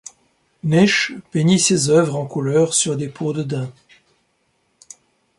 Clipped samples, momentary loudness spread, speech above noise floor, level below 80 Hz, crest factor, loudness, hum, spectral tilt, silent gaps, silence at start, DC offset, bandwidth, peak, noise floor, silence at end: under 0.1%; 11 LU; 48 dB; -58 dBFS; 16 dB; -18 LUFS; none; -4.5 dB/octave; none; 0.65 s; under 0.1%; 11.5 kHz; -4 dBFS; -66 dBFS; 1.65 s